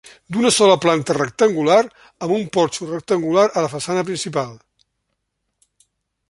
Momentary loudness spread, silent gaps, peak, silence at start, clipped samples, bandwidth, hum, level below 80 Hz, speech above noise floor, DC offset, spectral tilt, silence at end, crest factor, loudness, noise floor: 12 LU; none; -2 dBFS; 0.3 s; under 0.1%; 11.5 kHz; none; -60 dBFS; 57 dB; under 0.1%; -4 dB/octave; 1.75 s; 18 dB; -18 LUFS; -74 dBFS